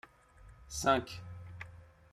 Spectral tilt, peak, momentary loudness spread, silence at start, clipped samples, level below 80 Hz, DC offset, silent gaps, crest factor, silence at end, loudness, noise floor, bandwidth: -4 dB/octave; -14 dBFS; 19 LU; 0.05 s; under 0.1%; -58 dBFS; under 0.1%; none; 24 dB; 0.2 s; -33 LUFS; -58 dBFS; 15.5 kHz